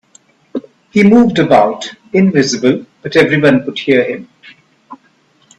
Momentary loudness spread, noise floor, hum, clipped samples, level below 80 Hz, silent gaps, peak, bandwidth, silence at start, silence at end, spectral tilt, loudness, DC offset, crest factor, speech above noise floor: 18 LU; -53 dBFS; none; under 0.1%; -50 dBFS; none; 0 dBFS; 9.8 kHz; 0.55 s; 0.65 s; -5.5 dB/octave; -11 LUFS; under 0.1%; 14 dB; 42 dB